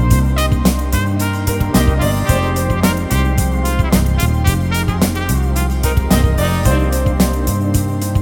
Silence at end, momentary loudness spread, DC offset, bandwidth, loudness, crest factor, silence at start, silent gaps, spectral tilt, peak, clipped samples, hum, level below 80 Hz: 0 s; 3 LU; under 0.1%; 18 kHz; -16 LUFS; 14 dB; 0 s; none; -5.5 dB/octave; 0 dBFS; under 0.1%; none; -18 dBFS